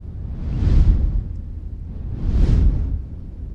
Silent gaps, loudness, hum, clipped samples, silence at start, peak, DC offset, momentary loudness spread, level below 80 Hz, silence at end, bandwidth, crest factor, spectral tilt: none; -22 LUFS; none; under 0.1%; 0 s; -4 dBFS; under 0.1%; 15 LU; -20 dBFS; 0 s; 5.6 kHz; 14 dB; -9.5 dB/octave